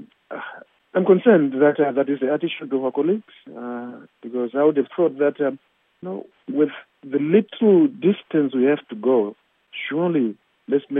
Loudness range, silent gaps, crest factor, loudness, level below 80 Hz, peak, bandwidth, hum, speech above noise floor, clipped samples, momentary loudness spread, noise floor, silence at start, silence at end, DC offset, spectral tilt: 4 LU; none; 18 dB; -20 LUFS; -82 dBFS; -2 dBFS; 3.8 kHz; none; 22 dB; under 0.1%; 19 LU; -41 dBFS; 0 s; 0 s; under 0.1%; -10.5 dB/octave